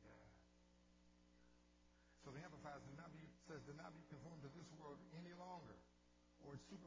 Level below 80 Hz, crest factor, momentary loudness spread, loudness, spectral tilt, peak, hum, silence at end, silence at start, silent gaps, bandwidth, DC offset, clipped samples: -78 dBFS; 18 dB; 8 LU; -60 LUFS; -6 dB/octave; -42 dBFS; 60 Hz at -70 dBFS; 0 s; 0 s; none; 8 kHz; under 0.1%; under 0.1%